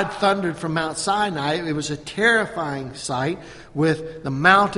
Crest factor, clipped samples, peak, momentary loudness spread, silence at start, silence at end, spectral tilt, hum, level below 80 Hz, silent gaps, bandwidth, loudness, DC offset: 22 dB; under 0.1%; 0 dBFS; 10 LU; 0 s; 0 s; -4.5 dB/octave; none; -52 dBFS; none; 11.5 kHz; -22 LUFS; under 0.1%